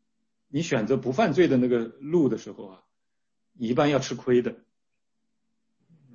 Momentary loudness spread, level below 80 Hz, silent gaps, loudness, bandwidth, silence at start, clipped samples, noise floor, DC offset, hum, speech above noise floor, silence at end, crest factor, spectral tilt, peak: 13 LU; -62 dBFS; none; -25 LUFS; 7.4 kHz; 0.55 s; under 0.1%; -85 dBFS; under 0.1%; none; 61 dB; 1.6 s; 18 dB; -6.5 dB/octave; -8 dBFS